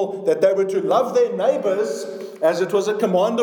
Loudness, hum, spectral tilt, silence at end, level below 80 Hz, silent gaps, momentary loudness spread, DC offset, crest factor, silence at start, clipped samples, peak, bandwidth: -20 LUFS; none; -5.5 dB/octave; 0 s; -84 dBFS; none; 5 LU; under 0.1%; 14 dB; 0 s; under 0.1%; -4 dBFS; 18.5 kHz